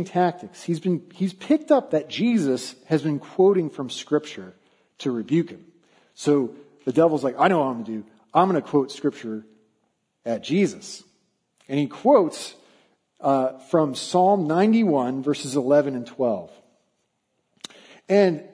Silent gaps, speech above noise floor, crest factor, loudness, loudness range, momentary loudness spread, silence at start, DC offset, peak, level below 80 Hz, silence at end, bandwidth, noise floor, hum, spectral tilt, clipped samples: none; 51 dB; 20 dB; -22 LUFS; 5 LU; 15 LU; 0 s; under 0.1%; -2 dBFS; -74 dBFS; 0.05 s; 11 kHz; -73 dBFS; none; -6.5 dB/octave; under 0.1%